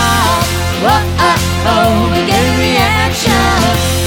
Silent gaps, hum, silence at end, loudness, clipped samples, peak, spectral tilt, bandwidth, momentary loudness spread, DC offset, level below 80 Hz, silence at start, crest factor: none; none; 0 s; -11 LUFS; under 0.1%; 0 dBFS; -4.5 dB/octave; 17.5 kHz; 2 LU; under 0.1%; -24 dBFS; 0 s; 10 dB